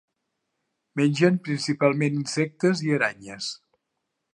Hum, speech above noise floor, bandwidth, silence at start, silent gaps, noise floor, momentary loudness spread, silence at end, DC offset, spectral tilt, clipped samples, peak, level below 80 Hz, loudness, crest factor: none; 56 dB; 11.5 kHz; 0.95 s; none; -80 dBFS; 12 LU; 0.75 s; under 0.1%; -5.5 dB/octave; under 0.1%; -6 dBFS; -72 dBFS; -24 LUFS; 20 dB